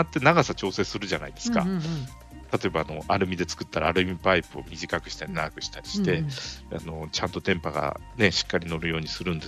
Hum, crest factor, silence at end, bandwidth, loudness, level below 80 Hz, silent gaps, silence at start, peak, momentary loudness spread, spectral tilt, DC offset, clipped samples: none; 22 dB; 0 s; 14.5 kHz; -27 LUFS; -46 dBFS; none; 0 s; -4 dBFS; 12 LU; -5 dB/octave; under 0.1%; under 0.1%